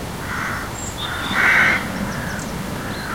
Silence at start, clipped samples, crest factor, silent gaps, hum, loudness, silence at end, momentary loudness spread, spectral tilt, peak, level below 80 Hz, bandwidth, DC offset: 0 s; under 0.1%; 18 dB; none; none; -20 LUFS; 0 s; 13 LU; -3.5 dB/octave; -4 dBFS; -38 dBFS; 16.5 kHz; 0.4%